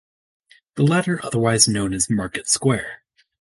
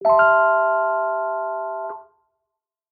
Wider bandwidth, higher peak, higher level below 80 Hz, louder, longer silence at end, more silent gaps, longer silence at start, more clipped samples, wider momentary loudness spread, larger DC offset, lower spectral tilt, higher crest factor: first, 12 kHz vs 4.7 kHz; first, 0 dBFS vs -4 dBFS; first, -50 dBFS vs -66 dBFS; about the same, -19 LUFS vs -19 LUFS; second, 0.45 s vs 0.9 s; neither; first, 0.75 s vs 0 s; neither; second, 9 LU vs 16 LU; neither; second, -4 dB/octave vs -7 dB/octave; first, 22 dB vs 16 dB